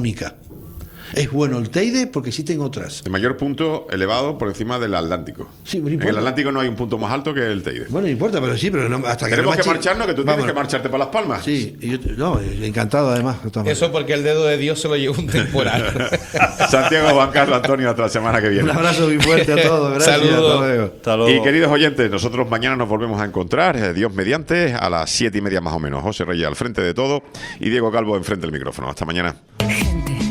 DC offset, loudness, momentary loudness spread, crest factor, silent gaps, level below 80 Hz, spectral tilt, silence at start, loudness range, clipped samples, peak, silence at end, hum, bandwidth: under 0.1%; -18 LUFS; 10 LU; 18 dB; none; -38 dBFS; -5 dB/octave; 0 s; 7 LU; under 0.1%; 0 dBFS; 0 s; none; 19 kHz